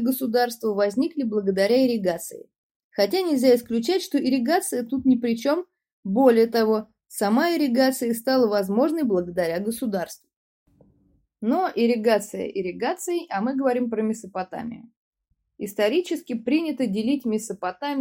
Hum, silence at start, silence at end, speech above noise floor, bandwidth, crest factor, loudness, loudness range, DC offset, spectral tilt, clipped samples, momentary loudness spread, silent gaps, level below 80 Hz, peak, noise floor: none; 0 s; 0 s; 41 dB; 16.5 kHz; 18 dB; -23 LUFS; 5 LU; under 0.1%; -5 dB/octave; under 0.1%; 11 LU; 2.58-2.90 s, 5.93-6.03 s, 10.36-10.66 s, 14.96-15.12 s; -66 dBFS; -6 dBFS; -64 dBFS